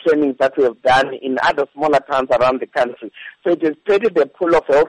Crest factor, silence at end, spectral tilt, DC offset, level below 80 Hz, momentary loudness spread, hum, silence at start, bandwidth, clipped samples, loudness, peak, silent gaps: 10 dB; 0 s; -5 dB/octave; under 0.1%; -50 dBFS; 6 LU; none; 0.05 s; 11 kHz; under 0.1%; -17 LUFS; -6 dBFS; none